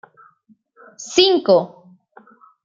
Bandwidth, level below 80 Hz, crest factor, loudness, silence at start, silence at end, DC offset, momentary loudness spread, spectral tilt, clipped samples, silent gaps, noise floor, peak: 7.6 kHz; -62 dBFS; 20 dB; -16 LUFS; 1 s; 1 s; under 0.1%; 20 LU; -3.5 dB/octave; under 0.1%; none; -57 dBFS; -2 dBFS